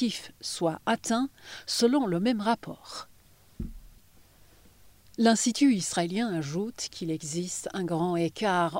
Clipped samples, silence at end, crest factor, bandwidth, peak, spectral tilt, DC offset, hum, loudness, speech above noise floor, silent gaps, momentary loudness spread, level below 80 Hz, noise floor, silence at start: under 0.1%; 0 s; 18 dB; 16 kHz; -10 dBFS; -4.5 dB/octave; under 0.1%; none; -28 LUFS; 30 dB; none; 17 LU; -54 dBFS; -58 dBFS; 0 s